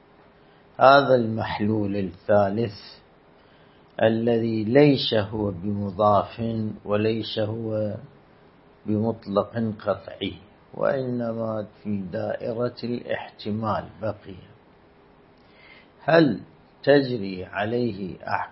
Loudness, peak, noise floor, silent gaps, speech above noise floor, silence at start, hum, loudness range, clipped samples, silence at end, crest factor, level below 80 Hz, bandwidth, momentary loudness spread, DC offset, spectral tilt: -24 LUFS; -2 dBFS; -54 dBFS; none; 31 dB; 0.8 s; none; 8 LU; under 0.1%; 0 s; 24 dB; -58 dBFS; 5.8 kHz; 14 LU; under 0.1%; -11 dB/octave